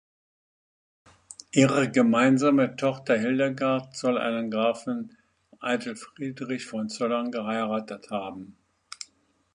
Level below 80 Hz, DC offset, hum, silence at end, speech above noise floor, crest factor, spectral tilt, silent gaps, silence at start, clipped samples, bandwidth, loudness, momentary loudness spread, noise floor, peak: -70 dBFS; under 0.1%; none; 1.05 s; 40 dB; 20 dB; -5.5 dB/octave; none; 1.55 s; under 0.1%; 10.5 kHz; -26 LUFS; 20 LU; -65 dBFS; -6 dBFS